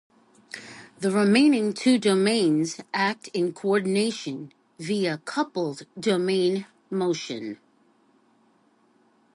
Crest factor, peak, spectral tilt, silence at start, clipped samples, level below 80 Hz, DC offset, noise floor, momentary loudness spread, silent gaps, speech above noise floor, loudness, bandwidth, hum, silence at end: 18 dB; -8 dBFS; -5 dB/octave; 0.55 s; under 0.1%; -74 dBFS; under 0.1%; -63 dBFS; 18 LU; none; 39 dB; -24 LUFS; 11.5 kHz; none; 1.8 s